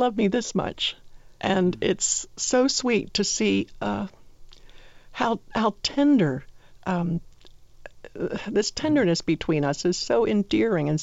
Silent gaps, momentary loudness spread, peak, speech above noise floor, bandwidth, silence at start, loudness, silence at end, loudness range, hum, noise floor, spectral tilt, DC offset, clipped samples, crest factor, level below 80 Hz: none; 10 LU; -10 dBFS; 26 dB; 8 kHz; 0 s; -24 LUFS; 0 s; 2 LU; none; -49 dBFS; -4.5 dB/octave; 0.2%; under 0.1%; 16 dB; -50 dBFS